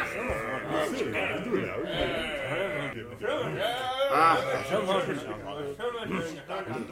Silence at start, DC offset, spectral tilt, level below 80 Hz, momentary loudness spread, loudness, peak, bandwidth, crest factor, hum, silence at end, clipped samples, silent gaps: 0 s; under 0.1%; -5 dB/octave; -54 dBFS; 11 LU; -30 LUFS; -10 dBFS; 16.5 kHz; 18 dB; none; 0 s; under 0.1%; none